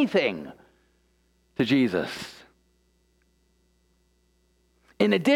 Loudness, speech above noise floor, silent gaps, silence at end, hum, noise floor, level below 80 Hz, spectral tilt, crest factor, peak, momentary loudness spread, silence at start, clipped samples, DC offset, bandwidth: -25 LUFS; 43 dB; none; 0 s; none; -67 dBFS; -66 dBFS; -6 dB/octave; 22 dB; -8 dBFS; 19 LU; 0 s; under 0.1%; under 0.1%; 14 kHz